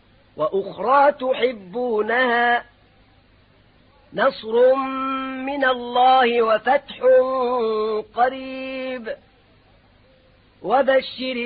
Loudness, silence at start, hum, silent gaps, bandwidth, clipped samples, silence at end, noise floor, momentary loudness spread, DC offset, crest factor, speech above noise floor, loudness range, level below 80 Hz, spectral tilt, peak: -20 LUFS; 0.35 s; none; none; 4.9 kHz; under 0.1%; 0 s; -55 dBFS; 12 LU; under 0.1%; 16 dB; 35 dB; 7 LU; -60 dBFS; -8.5 dB/octave; -6 dBFS